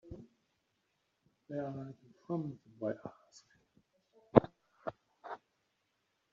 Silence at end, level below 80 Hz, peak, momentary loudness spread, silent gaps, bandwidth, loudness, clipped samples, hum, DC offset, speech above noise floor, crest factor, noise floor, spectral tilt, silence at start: 0.95 s; -66 dBFS; -4 dBFS; 24 LU; none; 7.4 kHz; -37 LUFS; under 0.1%; none; under 0.1%; 39 dB; 36 dB; -81 dBFS; -8 dB/octave; 0.05 s